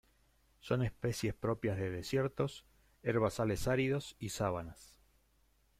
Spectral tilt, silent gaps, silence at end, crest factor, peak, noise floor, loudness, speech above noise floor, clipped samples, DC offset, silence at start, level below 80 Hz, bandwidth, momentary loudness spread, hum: -6 dB/octave; none; 0.95 s; 18 dB; -20 dBFS; -72 dBFS; -36 LUFS; 36 dB; under 0.1%; under 0.1%; 0.65 s; -56 dBFS; 15.5 kHz; 9 LU; none